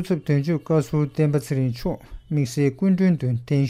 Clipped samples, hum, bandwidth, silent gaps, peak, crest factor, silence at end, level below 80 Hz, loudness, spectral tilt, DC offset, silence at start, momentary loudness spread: under 0.1%; none; 15 kHz; none; -8 dBFS; 14 dB; 0 s; -46 dBFS; -22 LUFS; -8 dB/octave; under 0.1%; 0 s; 7 LU